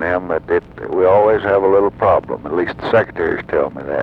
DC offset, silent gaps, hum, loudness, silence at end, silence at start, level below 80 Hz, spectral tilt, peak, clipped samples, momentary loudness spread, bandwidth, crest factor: under 0.1%; none; none; -16 LUFS; 0 s; 0 s; -44 dBFS; -8.5 dB/octave; -2 dBFS; under 0.1%; 8 LU; 5.6 kHz; 14 dB